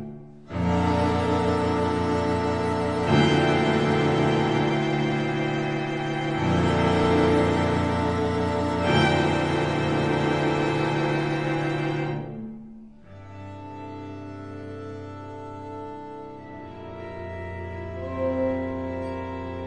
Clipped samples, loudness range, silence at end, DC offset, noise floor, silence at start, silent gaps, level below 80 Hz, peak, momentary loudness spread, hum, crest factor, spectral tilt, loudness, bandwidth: under 0.1%; 15 LU; 0 s; 0.2%; -45 dBFS; 0 s; none; -46 dBFS; -8 dBFS; 17 LU; none; 18 dB; -6.5 dB/octave; -24 LUFS; 10.5 kHz